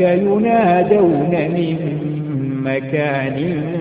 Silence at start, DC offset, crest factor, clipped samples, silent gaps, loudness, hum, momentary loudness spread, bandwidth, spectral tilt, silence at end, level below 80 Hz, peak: 0 s; under 0.1%; 14 dB; under 0.1%; none; -17 LUFS; none; 8 LU; 4.9 kHz; -13 dB/octave; 0 s; -50 dBFS; -2 dBFS